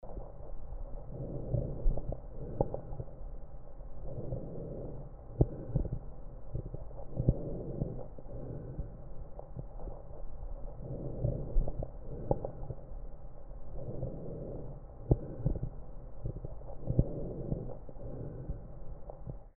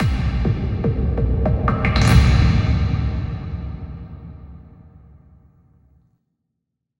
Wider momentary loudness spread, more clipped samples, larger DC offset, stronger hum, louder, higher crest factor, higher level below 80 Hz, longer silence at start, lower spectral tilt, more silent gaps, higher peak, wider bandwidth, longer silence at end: second, 16 LU vs 21 LU; neither; neither; neither; second, -40 LUFS vs -19 LUFS; first, 26 dB vs 20 dB; second, -40 dBFS vs -24 dBFS; about the same, 0 s vs 0 s; first, -11.5 dB/octave vs -7 dB/octave; neither; second, -10 dBFS vs 0 dBFS; second, 1.8 kHz vs 16.5 kHz; second, 0.1 s vs 2.4 s